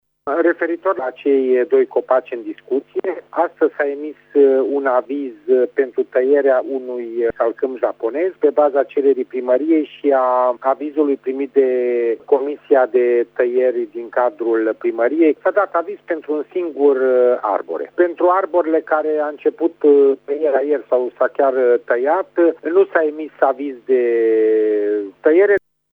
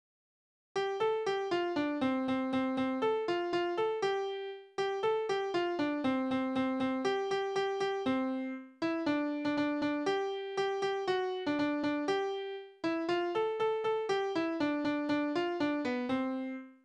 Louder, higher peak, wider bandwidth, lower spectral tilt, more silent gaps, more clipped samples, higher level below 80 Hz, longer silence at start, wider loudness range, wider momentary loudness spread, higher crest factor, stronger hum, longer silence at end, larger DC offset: first, -17 LUFS vs -33 LUFS; first, 0 dBFS vs -20 dBFS; second, 3.9 kHz vs 9.8 kHz; first, -7.5 dB/octave vs -5 dB/octave; neither; neither; first, -68 dBFS vs -74 dBFS; second, 0.25 s vs 0.75 s; about the same, 2 LU vs 1 LU; first, 8 LU vs 4 LU; about the same, 16 dB vs 14 dB; first, 50 Hz at -70 dBFS vs none; first, 0.35 s vs 0.1 s; neither